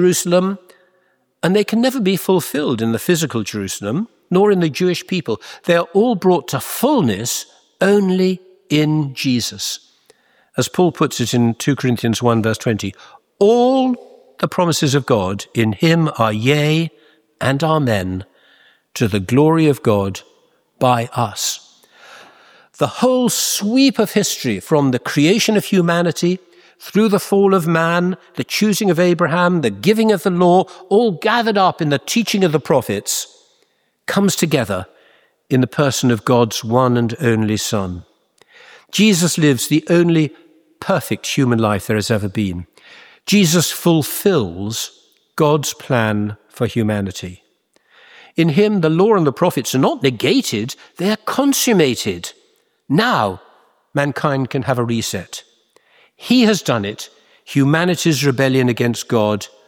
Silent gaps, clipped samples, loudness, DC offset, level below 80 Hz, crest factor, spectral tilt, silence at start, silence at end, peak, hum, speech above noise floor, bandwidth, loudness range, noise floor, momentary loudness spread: none; under 0.1%; -16 LUFS; under 0.1%; -56 dBFS; 16 dB; -5 dB/octave; 0 s; 0.2 s; 0 dBFS; none; 46 dB; over 20 kHz; 4 LU; -62 dBFS; 10 LU